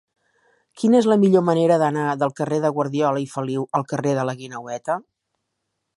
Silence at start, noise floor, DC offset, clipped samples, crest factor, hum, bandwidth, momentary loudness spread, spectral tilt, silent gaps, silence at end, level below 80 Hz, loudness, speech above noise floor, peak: 0.75 s; -77 dBFS; under 0.1%; under 0.1%; 18 dB; none; 11.5 kHz; 11 LU; -7 dB/octave; none; 0.95 s; -70 dBFS; -20 LUFS; 57 dB; -4 dBFS